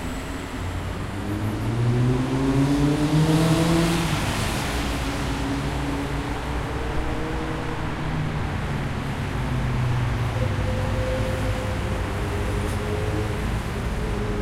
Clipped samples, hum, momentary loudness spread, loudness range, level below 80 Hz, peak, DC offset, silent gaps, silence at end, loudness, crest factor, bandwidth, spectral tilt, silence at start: under 0.1%; none; 8 LU; 6 LU; -32 dBFS; -8 dBFS; under 0.1%; none; 0 s; -25 LUFS; 16 dB; 16 kHz; -6 dB/octave; 0 s